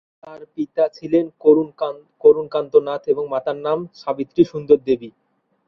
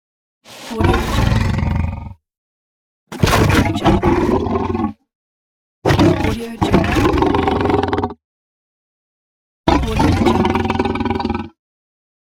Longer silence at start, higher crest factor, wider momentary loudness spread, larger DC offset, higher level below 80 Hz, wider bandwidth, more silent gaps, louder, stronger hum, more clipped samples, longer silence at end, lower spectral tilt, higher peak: second, 0.25 s vs 0.5 s; about the same, 18 dB vs 18 dB; about the same, 11 LU vs 11 LU; neither; second, -62 dBFS vs -28 dBFS; second, 6 kHz vs 18 kHz; second, none vs 2.38-3.07 s, 5.15-5.82 s, 8.24-9.64 s; about the same, -19 LUFS vs -17 LUFS; neither; neither; second, 0.6 s vs 0.75 s; first, -8.5 dB/octave vs -6.5 dB/octave; about the same, -2 dBFS vs 0 dBFS